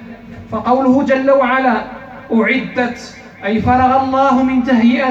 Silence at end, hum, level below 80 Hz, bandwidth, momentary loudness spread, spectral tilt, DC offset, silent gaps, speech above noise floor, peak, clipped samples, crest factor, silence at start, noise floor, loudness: 0 s; none; -42 dBFS; 7.8 kHz; 18 LU; -6.5 dB/octave; under 0.1%; none; 20 dB; -2 dBFS; under 0.1%; 12 dB; 0 s; -33 dBFS; -14 LUFS